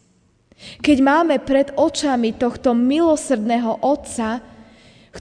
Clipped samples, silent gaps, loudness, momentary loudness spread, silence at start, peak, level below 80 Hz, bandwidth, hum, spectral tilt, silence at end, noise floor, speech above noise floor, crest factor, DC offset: under 0.1%; none; -18 LUFS; 8 LU; 0.6 s; -4 dBFS; -50 dBFS; 10 kHz; none; -4.5 dB/octave; 0 s; -58 dBFS; 41 dB; 16 dB; under 0.1%